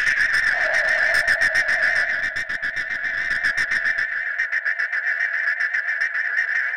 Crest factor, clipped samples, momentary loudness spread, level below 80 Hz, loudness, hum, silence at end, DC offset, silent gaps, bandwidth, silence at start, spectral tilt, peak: 14 dB; under 0.1%; 6 LU; -54 dBFS; -20 LUFS; none; 0 s; 0.6%; none; 16 kHz; 0 s; -0.5 dB/octave; -8 dBFS